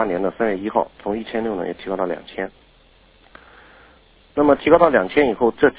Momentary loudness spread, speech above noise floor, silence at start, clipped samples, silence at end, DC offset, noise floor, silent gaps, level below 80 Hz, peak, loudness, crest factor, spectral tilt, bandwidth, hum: 14 LU; 34 dB; 0 s; under 0.1%; 0.05 s; under 0.1%; -53 dBFS; none; -50 dBFS; 0 dBFS; -19 LUFS; 20 dB; -9.5 dB/octave; 4 kHz; none